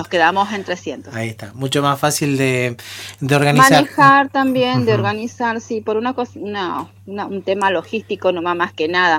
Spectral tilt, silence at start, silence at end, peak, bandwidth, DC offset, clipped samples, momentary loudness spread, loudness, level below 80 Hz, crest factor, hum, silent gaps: -4.5 dB/octave; 0 s; 0 s; 0 dBFS; 17.5 kHz; under 0.1%; under 0.1%; 15 LU; -17 LUFS; -62 dBFS; 16 dB; none; none